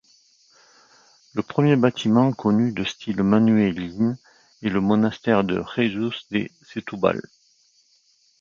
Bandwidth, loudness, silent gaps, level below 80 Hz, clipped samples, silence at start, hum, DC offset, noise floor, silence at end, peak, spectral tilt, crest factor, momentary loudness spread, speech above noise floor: 7.2 kHz; -22 LUFS; none; -56 dBFS; under 0.1%; 1.35 s; none; under 0.1%; -61 dBFS; 1.2 s; -2 dBFS; -7.5 dB/octave; 20 dB; 12 LU; 41 dB